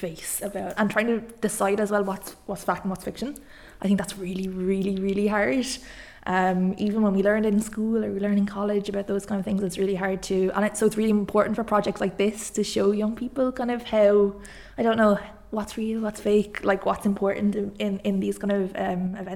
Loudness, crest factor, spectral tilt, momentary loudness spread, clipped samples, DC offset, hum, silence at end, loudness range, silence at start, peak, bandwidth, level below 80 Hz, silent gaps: -25 LUFS; 18 dB; -5.5 dB/octave; 9 LU; under 0.1%; under 0.1%; none; 0 s; 3 LU; 0 s; -6 dBFS; 15 kHz; -52 dBFS; none